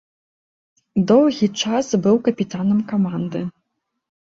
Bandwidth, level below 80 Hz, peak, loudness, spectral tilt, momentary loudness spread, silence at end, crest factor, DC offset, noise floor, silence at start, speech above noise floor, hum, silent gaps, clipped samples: 7.8 kHz; -60 dBFS; -4 dBFS; -19 LUFS; -6 dB/octave; 11 LU; 0.8 s; 16 dB; under 0.1%; -75 dBFS; 0.95 s; 57 dB; none; none; under 0.1%